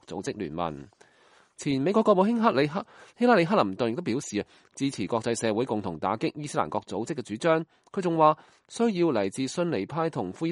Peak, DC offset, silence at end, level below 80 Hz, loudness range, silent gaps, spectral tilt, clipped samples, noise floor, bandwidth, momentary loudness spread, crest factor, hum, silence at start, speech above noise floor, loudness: -6 dBFS; under 0.1%; 0 s; -66 dBFS; 4 LU; none; -5.5 dB/octave; under 0.1%; -60 dBFS; 11.5 kHz; 12 LU; 20 dB; none; 0.1 s; 34 dB; -27 LUFS